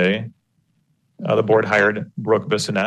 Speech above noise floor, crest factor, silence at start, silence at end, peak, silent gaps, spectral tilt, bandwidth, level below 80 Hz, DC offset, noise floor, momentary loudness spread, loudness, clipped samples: 47 dB; 16 dB; 0 s; 0 s; -4 dBFS; none; -5 dB/octave; 12.5 kHz; -64 dBFS; under 0.1%; -66 dBFS; 12 LU; -19 LUFS; under 0.1%